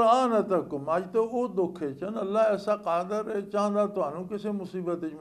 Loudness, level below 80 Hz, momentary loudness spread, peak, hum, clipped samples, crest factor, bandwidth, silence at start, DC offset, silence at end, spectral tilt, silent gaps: -28 LUFS; -68 dBFS; 8 LU; -10 dBFS; none; under 0.1%; 16 dB; 12.5 kHz; 0 s; under 0.1%; 0 s; -6.5 dB/octave; none